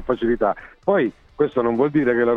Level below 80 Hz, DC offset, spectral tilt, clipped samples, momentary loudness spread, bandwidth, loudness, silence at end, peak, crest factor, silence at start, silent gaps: -46 dBFS; under 0.1%; -9 dB/octave; under 0.1%; 6 LU; 4.8 kHz; -21 LUFS; 0 s; -6 dBFS; 14 dB; 0 s; none